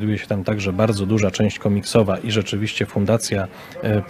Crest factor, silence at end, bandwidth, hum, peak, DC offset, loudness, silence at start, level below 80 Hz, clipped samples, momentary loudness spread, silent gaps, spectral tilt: 18 dB; 0 s; 14.5 kHz; none; -2 dBFS; under 0.1%; -20 LUFS; 0 s; -50 dBFS; under 0.1%; 5 LU; none; -5.5 dB/octave